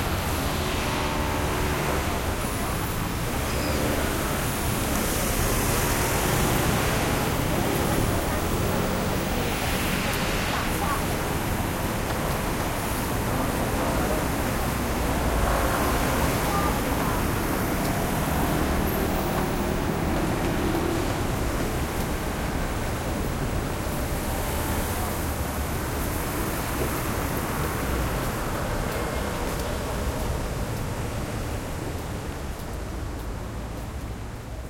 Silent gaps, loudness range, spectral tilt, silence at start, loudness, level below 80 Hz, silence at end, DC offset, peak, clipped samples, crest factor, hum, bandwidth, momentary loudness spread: none; 5 LU; -4.5 dB/octave; 0 s; -26 LUFS; -32 dBFS; 0 s; under 0.1%; -8 dBFS; under 0.1%; 18 dB; none; 16.5 kHz; 7 LU